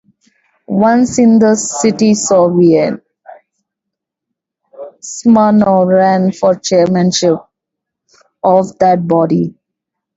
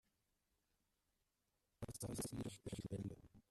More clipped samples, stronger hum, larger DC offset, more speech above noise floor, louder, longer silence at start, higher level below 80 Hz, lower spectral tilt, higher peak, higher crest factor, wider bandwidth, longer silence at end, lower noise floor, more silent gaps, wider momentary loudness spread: neither; neither; neither; first, 69 dB vs 39 dB; first, -11 LUFS vs -50 LUFS; second, 0.7 s vs 1.8 s; first, -54 dBFS vs -68 dBFS; about the same, -5.5 dB/octave vs -5.5 dB/octave; first, 0 dBFS vs -34 dBFS; second, 12 dB vs 18 dB; second, 8 kHz vs 14 kHz; first, 0.65 s vs 0.1 s; second, -79 dBFS vs -88 dBFS; neither; about the same, 9 LU vs 8 LU